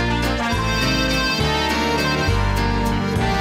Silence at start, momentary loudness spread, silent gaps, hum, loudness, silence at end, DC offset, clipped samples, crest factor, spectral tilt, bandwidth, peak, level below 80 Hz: 0 s; 2 LU; none; none; -19 LUFS; 0 s; under 0.1%; under 0.1%; 10 dB; -4.5 dB/octave; 16.5 kHz; -8 dBFS; -26 dBFS